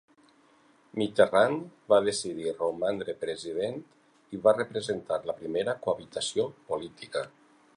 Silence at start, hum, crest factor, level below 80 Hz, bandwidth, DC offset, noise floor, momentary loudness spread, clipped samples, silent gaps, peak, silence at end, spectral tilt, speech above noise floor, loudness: 0.95 s; none; 22 dB; -68 dBFS; 11 kHz; under 0.1%; -62 dBFS; 11 LU; under 0.1%; none; -6 dBFS; 0.5 s; -4 dB/octave; 33 dB; -29 LUFS